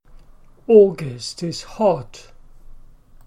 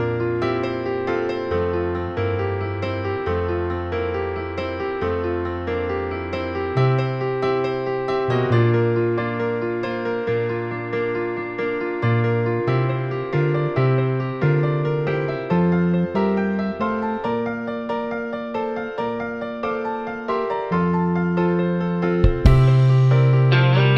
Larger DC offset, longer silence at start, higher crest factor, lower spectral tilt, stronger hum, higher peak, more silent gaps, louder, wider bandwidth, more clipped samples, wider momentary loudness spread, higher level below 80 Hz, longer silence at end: neither; first, 0.7 s vs 0 s; about the same, 20 dB vs 20 dB; second, -6 dB/octave vs -9 dB/octave; neither; about the same, -2 dBFS vs 0 dBFS; neither; first, -18 LUFS vs -21 LUFS; first, 11 kHz vs 6.2 kHz; neither; first, 19 LU vs 10 LU; second, -46 dBFS vs -34 dBFS; first, 0.45 s vs 0 s